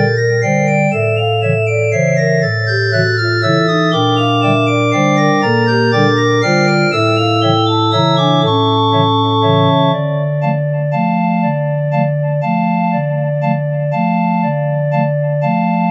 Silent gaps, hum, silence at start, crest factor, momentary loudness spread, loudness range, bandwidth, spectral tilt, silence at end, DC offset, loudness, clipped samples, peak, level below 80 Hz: none; none; 0 s; 12 dB; 4 LU; 3 LU; 8.4 kHz; -6.5 dB/octave; 0 s; under 0.1%; -14 LUFS; under 0.1%; 0 dBFS; -64 dBFS